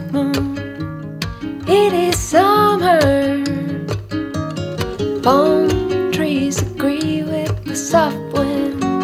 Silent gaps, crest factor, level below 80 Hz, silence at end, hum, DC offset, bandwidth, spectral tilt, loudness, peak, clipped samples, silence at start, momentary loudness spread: none; 16 dB; -38 dBFS; 0 s; none; under 0.1%; 16.5 kHz; -5.5 dB/octave; -17 LUFS; 0 dBFS; under 0.1%; 0 s; 11 LU